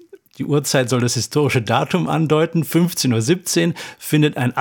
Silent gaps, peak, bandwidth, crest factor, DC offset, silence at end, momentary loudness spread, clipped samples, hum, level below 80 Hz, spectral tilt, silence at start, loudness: none; -2 dBFS; 17.5 kHz; 16 dB; under 0.1%; 0 s; 4 LU; under 0.1%; none; -60 dBFS; -5 dB/octave; 0.4 s; -18 LUFS